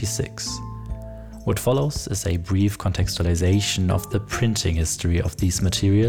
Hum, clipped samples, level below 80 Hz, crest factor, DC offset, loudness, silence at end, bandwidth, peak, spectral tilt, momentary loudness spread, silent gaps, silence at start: none; under 0.1%; -34 dBFS; 12 dB; 0.5%; -23 LUFS; 0 s; 17.5 kHz; -10 dBFS; -5 dB/octave; 11 LU; none; 0 s